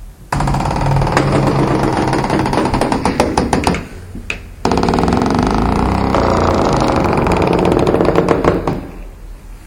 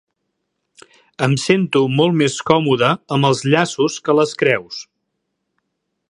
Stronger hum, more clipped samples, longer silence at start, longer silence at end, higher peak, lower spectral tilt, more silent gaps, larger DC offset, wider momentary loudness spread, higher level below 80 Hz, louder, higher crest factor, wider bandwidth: neither; neither; second, 0 s vs 1.2 s; second, 0 s vs 1.3 s; about the same, 0 dBFS vs 0 dBFS; about the same, -6.5 dB/octave vs -5.5 dB/octave; neither; neither; first, 10 LU vs 5 LU; first, -26 dBFS vs -60 dBFS; about the same, -15 LUFS vs -16 LUFS; about the same, 14 dB vs 18 dB; first, 16.5 kHz vs 11.5 kHz